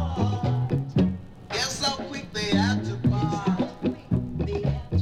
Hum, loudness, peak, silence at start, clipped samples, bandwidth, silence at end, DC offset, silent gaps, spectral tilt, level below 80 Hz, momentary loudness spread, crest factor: none; -26 LUFS; -10 dBFS; 0 s; under 0.1%; 13.5 kHz; 0 s; under 0.1%; none; -5.5 dB/octave; -40 dBFS; 6 LU; 16 dB